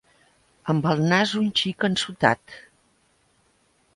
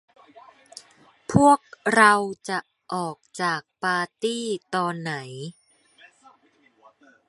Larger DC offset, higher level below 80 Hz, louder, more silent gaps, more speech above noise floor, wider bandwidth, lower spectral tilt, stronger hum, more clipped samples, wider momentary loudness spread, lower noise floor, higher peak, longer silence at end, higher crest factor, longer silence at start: neither; about the same, -62 dBFS vs -60 dBFS; about the same, -22 LUFS vs -23 LUFS; neither; about the same, 42 dB vs 39 dB; about the same, 11.5 kHz vs 11.5 kHz; about the same, -5 dB/octave vs -4.5 dB/octave; neither; neither; second, 9 LU vs 23 LU; about the same, -64 dBFS vs -61 dBFS; about the same, -2 dBFS vs -2 dBFS; second, 1.4 s vs 1.8 s; about the same, 24 dB vs 24 dB; second, 0.65 s vs 1.3 s